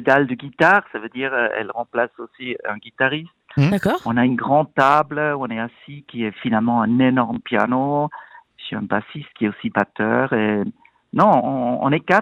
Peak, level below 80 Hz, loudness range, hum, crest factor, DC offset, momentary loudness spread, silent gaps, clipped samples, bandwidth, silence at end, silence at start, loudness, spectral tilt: -2 dBFS; -58 dBFS; 3 LU; none; 16 dB; under 0.1%; 13 LU; none; under 0.1%; 12.5 kHz; 0 s; 0 s; -20 LUFS; -7.5 dB/octave